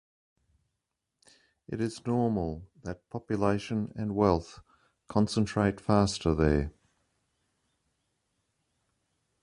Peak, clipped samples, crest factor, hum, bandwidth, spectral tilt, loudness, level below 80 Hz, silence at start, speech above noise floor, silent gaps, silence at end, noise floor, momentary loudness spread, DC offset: -8 dBFS; under 0.1%; 22 dB; none; 11 kHz; -6.5 dB/octave; -29 LUFS; -46 dBFS; 1.7 s; 56 dB; none; 2.75 s; -85 dBFS; 15 LU; under 0.1%